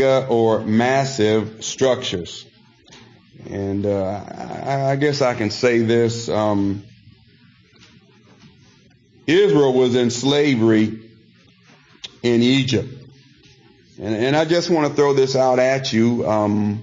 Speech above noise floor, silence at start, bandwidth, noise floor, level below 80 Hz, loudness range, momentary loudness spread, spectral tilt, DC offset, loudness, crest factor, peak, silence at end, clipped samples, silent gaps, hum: 35 dB; 0 s; 7.6 kHz; -52 dBFS; -58 dBFS; 6 LU; 13 LU; -5.5 dB/octave; under 0.1%; -18 LUFS; 14 dB; -6 dBFS; 0 s; under 0.1%; none; none